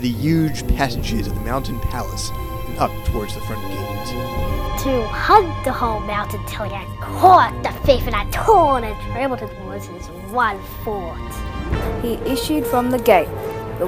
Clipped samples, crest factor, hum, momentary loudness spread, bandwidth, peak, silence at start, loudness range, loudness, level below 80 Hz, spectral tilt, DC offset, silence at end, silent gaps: under 0.1%; 20 dB; none; 14 LU; over 20 kHz; 0 dBFS; 0 s; 8 LU; -20 LUFS; -30 dBFS; -5.5 dB/octave; under 0.1%; 0 s; none